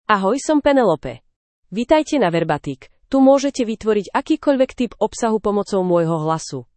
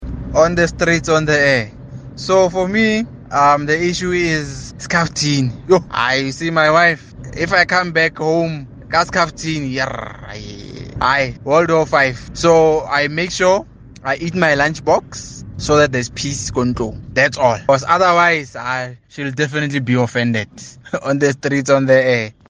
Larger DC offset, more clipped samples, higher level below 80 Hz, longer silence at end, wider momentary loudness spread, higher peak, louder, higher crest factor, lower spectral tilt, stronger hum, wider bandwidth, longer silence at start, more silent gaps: neither; neither; second, -48 dBFS vs -40 dBFS; about the same, 0.15 s vs 0.2 s; second, 10 LU vs 15 LU; about the same, -2 dBFS vs 0 dBFS; second, -18 LUFS vs -15 LUFS; about the same, 16 dB vs 16 dB; about the same, -5.5 dB/octave vs -4.5 dB/octave; neither; second, 8.8 kHz vs 10 kHz; about the same, 0.1 s vs 0 s; first, 1.36-1.63 s vs none